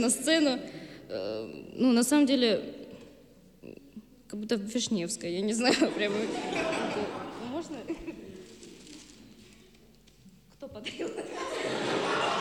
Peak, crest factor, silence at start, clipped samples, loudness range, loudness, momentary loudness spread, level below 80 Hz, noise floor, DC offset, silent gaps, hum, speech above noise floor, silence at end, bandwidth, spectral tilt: -12 dBFS; 20 dB; 0 s; under 0.1%; 14 LU; -29 LUFS; 24 LU; -64 dBFS; -58 dBFS; under 0.1%; none; none; 30 dB; 0 s; 14.5 kHz; -3.5 dB/octave